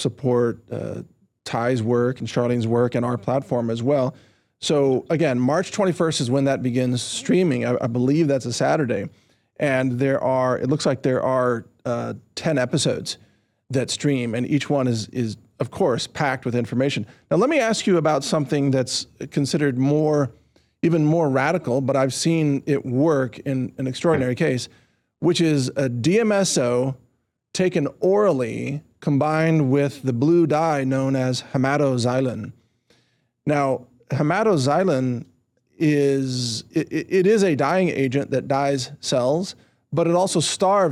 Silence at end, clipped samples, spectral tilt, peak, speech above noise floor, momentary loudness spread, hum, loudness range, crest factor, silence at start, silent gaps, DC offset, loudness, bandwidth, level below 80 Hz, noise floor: 0 s; under 0.1%; -5.5 dB/octave; -8 dBFS; 46 dB; 9 LU; none; 3 LU; 12 dB; 0 s; none; under 0.1%; -21 LUFS; 13.5 kHz; -62 dBFS; -67 dBFS